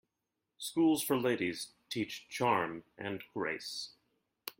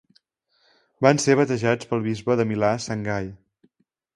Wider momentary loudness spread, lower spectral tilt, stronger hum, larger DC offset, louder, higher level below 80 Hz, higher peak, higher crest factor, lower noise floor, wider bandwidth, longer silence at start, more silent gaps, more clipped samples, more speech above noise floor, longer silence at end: first, 13 LU vs 9 LU; second, -4 dB/octave vs -5.5 dB/octave; neither; neither; second, -35 LUFS vs -22 LUFS; second, -76 dBFS vs -56 dBFS; second, -16 dBFS vs 0 dBFS; about the same, 20 dB vs 24 dB; first, -87 dBFS vs -69 dBFS; first, 16.5 kHz vs 11.5 kHz; second, 0.6 s vs 1 s; neither; neither; first, 53 dB vs 48 dB; second, 0.1 s vs 0.8 s